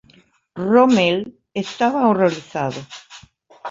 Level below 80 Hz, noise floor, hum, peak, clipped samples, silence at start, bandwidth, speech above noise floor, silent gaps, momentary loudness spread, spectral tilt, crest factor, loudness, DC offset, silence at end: -62 dBFS; -54 dBFS; none; -2 dBFS; under 0.1%; 0.55 s; 7.8 kHz; 37 dB; none; 22 LU; -5.5 dB/octave; 16 dB; -18 LUFS; under 0.1%; 0 s